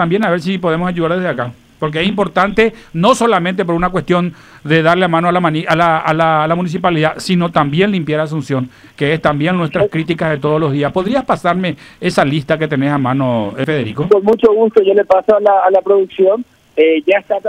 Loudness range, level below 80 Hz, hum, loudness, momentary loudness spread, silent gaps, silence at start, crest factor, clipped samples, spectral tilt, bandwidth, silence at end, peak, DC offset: 4 LU; -44 dBFS; none; -14 LUFS; 7 LU; none; 0 s; 14 dB; under 0.1%; -6.5 dB/octave; 13 kHz; 0 s; 0 dBFS; under 0.1%